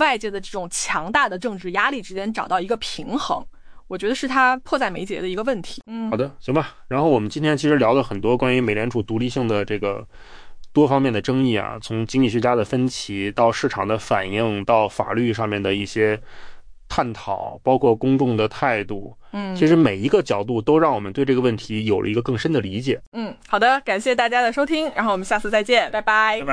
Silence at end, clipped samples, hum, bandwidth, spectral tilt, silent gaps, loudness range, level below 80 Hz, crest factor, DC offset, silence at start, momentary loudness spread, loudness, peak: 0 s; under 0.1%; none; 10.5 kHz; -5.5 dB/octave; 23.07-23.12 s; 3 LU; -46 dBFS; 16 dB; under 0.1%; 0 s; 9 LU; -21 LUFS; -4 dBFS